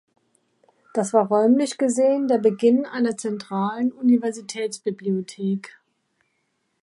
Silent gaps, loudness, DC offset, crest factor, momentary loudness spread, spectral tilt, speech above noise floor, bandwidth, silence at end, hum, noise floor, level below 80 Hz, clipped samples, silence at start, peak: none; -22 LUFS; under 0.1%; 18 dB; 10 LU; -6 dB/octave; 51 dB; 11.5 kHz; 1.15 s; none; -72 dBFS; -74 dBFS; under 0.1%; 0.95 s; -4 dBFS